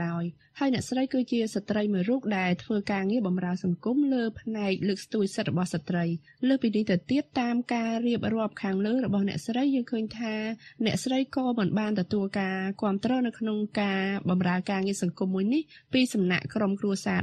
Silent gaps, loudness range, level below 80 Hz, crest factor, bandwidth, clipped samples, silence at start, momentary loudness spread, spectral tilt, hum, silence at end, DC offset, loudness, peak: none; 1 LU; -64 dBFS; 18 dB; 12 kHz; under 0.1%; 0 s; 4 LU; -6 dB/octave; none; 0 s; under 0.1%; -28 LUFS; -10 dBFS